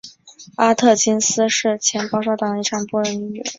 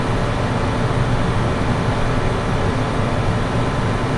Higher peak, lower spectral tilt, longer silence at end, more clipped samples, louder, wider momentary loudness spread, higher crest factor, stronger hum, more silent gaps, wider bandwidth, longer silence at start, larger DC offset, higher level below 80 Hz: first, -2 dBFS vs -6 dBFS; second, -2.5 dB/octave vs -6.5 dB/octave; about the same, 0.05 s vs 0 s; neither; about the same, -18 LUFS vs -20 LUFS; first, 8 LU vs 1 LU; first, 18 dB vs 12 dB; neither; neither; second, 7.8 kHz vs 11.5 kHz; about the same, 0.05 s vs 0 s; neither; second, -62 dBFS vs -26 dBFS